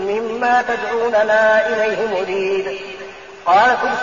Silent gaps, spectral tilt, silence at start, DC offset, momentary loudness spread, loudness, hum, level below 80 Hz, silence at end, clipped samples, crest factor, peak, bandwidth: none; -1 dB/octave; 0 s; 0.3%; 14 LU; -16 LUFS; none; -56 dBFS; 0 s; under 0.1%; 14 dB; -4 dBFS; 7.2 kHz